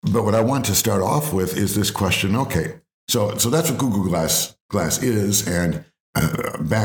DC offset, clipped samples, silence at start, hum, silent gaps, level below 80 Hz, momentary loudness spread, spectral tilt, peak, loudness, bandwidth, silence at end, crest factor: under 0.1%; under 0.1%; 0.05 s; none; 2.94-3.07 s, 4.61-4.69 s, 6.00-6.13 s; -46 dBFS; 6 LU; -4.5 dB/octave; -4 dBFS; -20 LUFS; over 20 kHz; 0 s; 16 dB